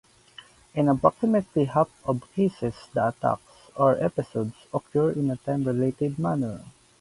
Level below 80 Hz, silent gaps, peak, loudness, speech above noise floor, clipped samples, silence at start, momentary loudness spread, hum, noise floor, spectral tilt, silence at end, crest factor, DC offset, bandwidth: -58 dBFS; none; -2 dBFS; -26 LUFS; 26 dB; under 0.1%; 0.75 s; 11 LU; none; -51 dBFS; -8.5 dB/octave; 0.3 s; 22 dB; under 0.1%; 11.5 kHz